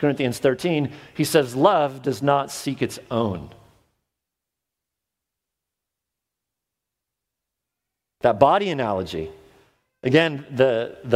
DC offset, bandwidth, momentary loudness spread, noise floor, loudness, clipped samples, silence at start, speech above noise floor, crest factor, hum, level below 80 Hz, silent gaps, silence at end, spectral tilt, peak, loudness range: under 0.1%; 16 kHz; 11 LU; -85 dBFS; -22 LUFS; under 0.1%; 0 s; 64 dB; 24 dB; none; -58 dBFS; none; 0 s; -5.5 dB/octave; 0 dBFS; 10 LU